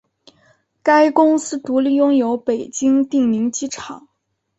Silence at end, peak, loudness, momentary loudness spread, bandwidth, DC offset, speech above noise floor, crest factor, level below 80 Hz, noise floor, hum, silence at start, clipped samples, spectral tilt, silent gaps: 0.6 s; -2 dBFS; -17 LUFS; 13 LU; 8.2 kHz; under 0.1%; 41 dB; 16 dB; -62 dBFS; -58 dBFS; none; 0.85 s; under 0.1%; -4 dB/octave; none